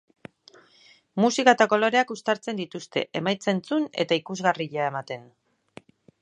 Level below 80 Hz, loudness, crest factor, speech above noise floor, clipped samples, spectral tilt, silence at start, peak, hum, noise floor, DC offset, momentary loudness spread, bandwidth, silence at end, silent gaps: -76 dBFS; -24 LUFS; 24 dB; 33 dB; under 0.1%; -4.5 dB/octave; 1.15 s; -2 dBFS; none; -57 dBFS; under 0.1%; 13 LU; 10.5 kHz; 1 s; none